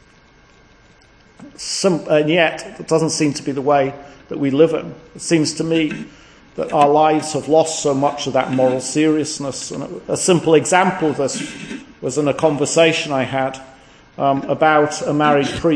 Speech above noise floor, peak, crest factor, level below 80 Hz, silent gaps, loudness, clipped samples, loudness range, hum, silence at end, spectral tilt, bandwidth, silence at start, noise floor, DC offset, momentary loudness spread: 32 dB; 0 dBFS; 18 dB; -52 dBFS; none; -17 LUFS; under 0.1%; 2 LU; none; 0 s; -4.5 dB/octave; 10.5 kHz; 1.4 s; -49 dBFS; under 0.1%; 14 LU